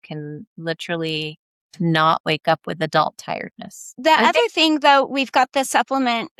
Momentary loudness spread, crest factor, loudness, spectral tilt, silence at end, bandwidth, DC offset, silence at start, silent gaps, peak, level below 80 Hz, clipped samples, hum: 16 LU; 18 dB; -19 LUFS; -4 dB/octave; 0.1 s; 14.5 kHz; under 0.1%; 0.1 s; 0.47-0.56 s, 1.38-1.70 s, 2.20-2.24 s; -2 dBFS; -68 dBFS; under 0.1%; none